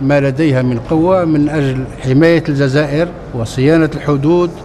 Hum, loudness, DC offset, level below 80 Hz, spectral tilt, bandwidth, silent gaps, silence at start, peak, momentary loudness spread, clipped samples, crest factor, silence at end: none; -13 LUFS; under 0.1%; -36 dBFS; -7.5 dB/octave; 12 kHz; none; 0 s; 0 dBFS; 7 LU; under 0.1%; 12 dB; 0 s